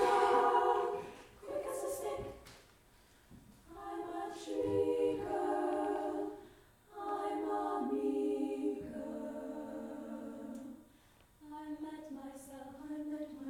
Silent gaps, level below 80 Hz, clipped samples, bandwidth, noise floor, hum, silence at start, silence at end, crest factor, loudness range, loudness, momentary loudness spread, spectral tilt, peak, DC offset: none; -68 dBFS; under 0.1%; 18.5 kHz; -65 dBFS; none; 0 s; 0 s; 20 dB; 10 LU; -37 LUFS; 18 LU; -5 dB/octave; -18 dBFS; under 0.1%